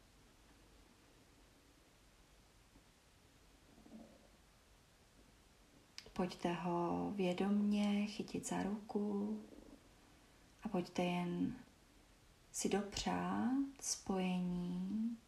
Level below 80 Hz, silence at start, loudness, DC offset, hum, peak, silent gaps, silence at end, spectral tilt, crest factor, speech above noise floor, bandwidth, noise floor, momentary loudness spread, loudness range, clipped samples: -68 dBFS; 0.75 s; -40 LUFS; under 0.1%; none; -24 dBFS; none; 0.05 s; -5 dB/octave; 18 dB; 29 dB; 14 kHz; -68 dBFS; 20 LU; 6 LU; under 0.1%